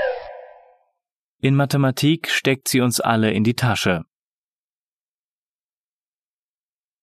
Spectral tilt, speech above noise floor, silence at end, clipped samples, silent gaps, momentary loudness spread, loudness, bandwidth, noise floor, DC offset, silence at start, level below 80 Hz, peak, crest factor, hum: -5 dB/octave; over 71 dB; 3 s; under 0.1%; 1.12-1.39 s; 7 LU; -19 LUFS; 14 kHz; under -90 dBFS; under 0.1%; 0 s; -58 dBFS; -4 dBFS; 20 dB; none